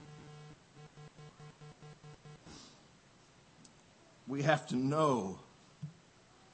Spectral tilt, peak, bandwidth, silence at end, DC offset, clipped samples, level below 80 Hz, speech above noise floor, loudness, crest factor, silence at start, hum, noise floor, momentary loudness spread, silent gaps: -6 dB/octave; -14 dBFS; 8.4 kHz; 0.6 s; under 0.1%; under 0.1%; -74 dBFS; 31 dB; -34 LUFS; 26 dB; 0 s; none; -63 dBFS; 24 LU; none